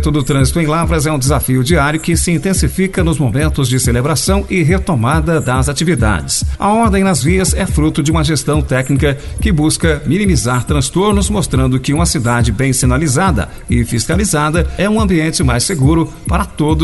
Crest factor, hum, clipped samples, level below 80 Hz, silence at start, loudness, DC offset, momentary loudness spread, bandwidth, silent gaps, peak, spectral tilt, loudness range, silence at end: 12 dB; none; under 0.1%; -22 dBFS; 0 s; -13 LUFS; under 0.1%; 3 LU; 12 kHz; none; 0 dBFS; -5 dB/octave; 1 LU; 0 s